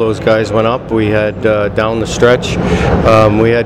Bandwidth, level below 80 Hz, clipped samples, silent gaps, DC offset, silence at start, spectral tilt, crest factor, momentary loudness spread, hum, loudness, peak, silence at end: 12.5 kHz; -26 dBFS; under 0.1%; none; under 0.1%; 0 s; -6 dB/octave; 10 dB; 6 LU; none; -11 LUFS; 0 dBFS; 0 s